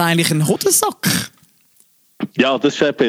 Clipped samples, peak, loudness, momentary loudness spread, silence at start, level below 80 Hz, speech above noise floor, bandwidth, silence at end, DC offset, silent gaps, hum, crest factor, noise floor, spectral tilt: under 0.1%; -2 dBFS; -16 LUFS; 12 LU; 0 s; -58 dBFS; 39 dB; 16.5 kHz; 0 s; under 0.1%; none; none; 16 dB; -55 dBFS; -3.5 dB/octave